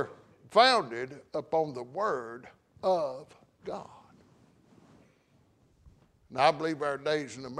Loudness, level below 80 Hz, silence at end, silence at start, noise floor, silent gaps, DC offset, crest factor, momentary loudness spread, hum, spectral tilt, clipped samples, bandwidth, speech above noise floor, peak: -29 LUFS; -70 dBFS; 0 s; 0 s; -66 dBFS; none; under 0.1%; 24 dB; 19 LU; none; -4 dB/octave; under 0.1%; 11 kHz; 37 dB; -8 dBFS